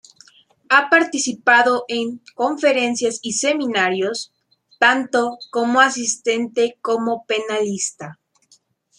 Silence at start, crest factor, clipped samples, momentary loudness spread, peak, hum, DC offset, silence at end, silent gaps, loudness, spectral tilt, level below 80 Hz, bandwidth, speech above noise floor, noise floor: 0.7 s; 18 dB; under 0.1%; 10 LU; 0 dBFS; none; under 0.1%; 0.85 s; none; -18 LUFS; -2 dB/octave; -72 dBFS; 11.5 kHz; 39 dB; -58 dBFS